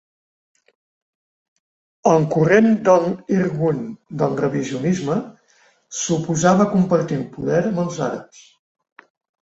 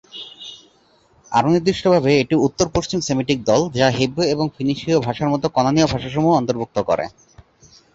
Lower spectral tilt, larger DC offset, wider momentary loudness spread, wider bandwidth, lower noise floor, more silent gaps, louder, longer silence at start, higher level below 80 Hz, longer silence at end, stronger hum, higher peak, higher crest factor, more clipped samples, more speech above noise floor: about the same, -6 dB/octave vs -5.5 dB/octave; neither; first, 11 LU vs 7 LU; about the same, 8 kHz vs 8 kHz; about the same, -57 dBFS vs -56 dBFS; neither; about the same, -19 LUFS vs -18 LUFS; first, 2.05 s vs 0.15 s; second, -58 dBFS vs -46 dBFS; first, 1.2 s vs 0.85 s; neither; about the same, -2 dBFS vs -4 dBFS; about the same, 18 dB vs 16 dB; neither; about the same, 39 dB vs 38 dB